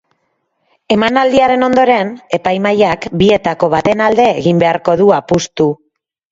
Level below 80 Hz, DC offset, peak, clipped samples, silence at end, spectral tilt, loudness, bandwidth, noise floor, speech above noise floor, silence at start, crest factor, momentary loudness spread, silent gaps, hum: -44 dBFS; under 0.1%; 0 dBFS; under 0.1%; 0.6 s; -5.5 dB/octave; -12 LUFS; 7.8 kHz; -65 dBFS; 54 dB; 0.9 s; 12 dB; 6 LU; none; none